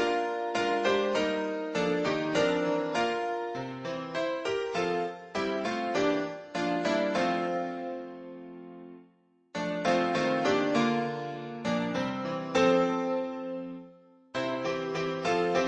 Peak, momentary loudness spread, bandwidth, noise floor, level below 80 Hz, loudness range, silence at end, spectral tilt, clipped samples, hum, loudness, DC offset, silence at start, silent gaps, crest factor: -12 dBFS; 12 LU; 10 kHz; -64 dBFS; -66 dBFS; 4 LU; 0 s; -5 dB/octave; under 0.1%; none; -30 LUFS; under 0.1%; 0 s; none; 18 dB